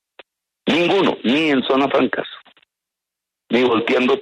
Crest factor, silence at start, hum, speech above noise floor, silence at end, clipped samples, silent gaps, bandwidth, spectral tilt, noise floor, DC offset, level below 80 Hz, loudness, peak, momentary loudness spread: 14 dB; 0.65 s; none; 67 dB; 0 s; under 0.1%; none; 10 kHz; -5.5 dB/octave; -84 dBFS; under 0.1%; -62 dBFS; -18 LUFS; -4 dBFS; 7 LU